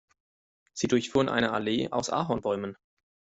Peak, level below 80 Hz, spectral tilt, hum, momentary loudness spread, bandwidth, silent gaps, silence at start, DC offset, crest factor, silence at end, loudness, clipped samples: -10 dBFS; -60 dBFS; -4.5 dB/octave; none; 8 LU; 8.2 kHz; none; 0.75 s; under 0.1%; 20 dB; 0.65 s; -28 LUFS; under 0.1%